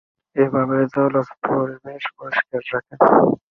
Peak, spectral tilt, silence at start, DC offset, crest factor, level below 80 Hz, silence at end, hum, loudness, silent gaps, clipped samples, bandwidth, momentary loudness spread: -2 dBFS; -9 dB/octave; 0.35 s; under 0.1%; 18 dB; -60 dBFS; 0.15 s; none; -19 LUFS; none; under 0.1%; 6 kHz; 14 LU